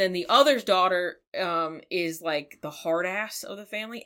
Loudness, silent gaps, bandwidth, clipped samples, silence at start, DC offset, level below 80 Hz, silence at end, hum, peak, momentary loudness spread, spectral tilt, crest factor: -26 LUFS; 1.27-1.32 s; 17 kHz; under 0.1%; 0 s; under 0.1%; -74 dBFS; 0.05 s; none; -6 dBFS; 14 LU; -3 dB/octave; 20 dB